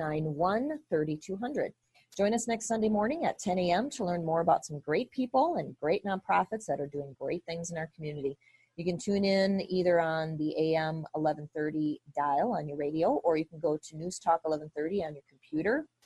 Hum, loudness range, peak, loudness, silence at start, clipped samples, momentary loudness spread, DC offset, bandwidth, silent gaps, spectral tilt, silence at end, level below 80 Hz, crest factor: none; 3 LU; -14 dBFS; -31 LUFS; 0 s; under 0.1%; 9 LU; under 0.1%; 12 kHz; none; -5.5 dB/octave; 0.2 s; -66 dBFS; 18 dB